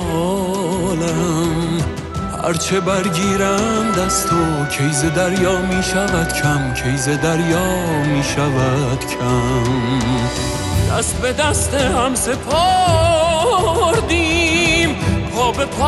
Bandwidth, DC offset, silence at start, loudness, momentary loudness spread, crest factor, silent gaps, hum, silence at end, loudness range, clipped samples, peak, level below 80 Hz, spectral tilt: 13.5 kHz; under 0.1%; 0 s; -17 LUFS; 5 LU; 14 dB; none; none; 0 s; 3 LU; under 0.1%; -2 dBFS; -30 dBFS; -4.5 dB/octave